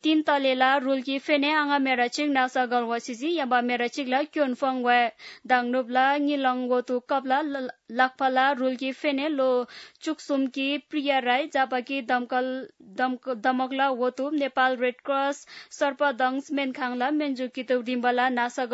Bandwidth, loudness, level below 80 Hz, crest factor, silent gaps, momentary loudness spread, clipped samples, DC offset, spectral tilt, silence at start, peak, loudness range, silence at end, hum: 8 kHz; -25 LUFS; -82 dBFS; 18 dB; none; 7 LU; under 0.1%; under 0.1%; -3 dB/octave; 0.05 s; -6 dBFS; 2 LU; 0 s; none